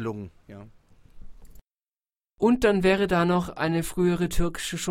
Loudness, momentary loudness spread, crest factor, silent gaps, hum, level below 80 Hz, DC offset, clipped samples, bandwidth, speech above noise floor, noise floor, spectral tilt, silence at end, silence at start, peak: -24 LUFS; 10 LU; 18 dB; none; none; -40 dBFS; under 0.1%; under 0.1%; 16 kHz; over 66 dB; under -90 dBFS; -5.5 dB/octave; 0 s; 0 s; -8 dBFS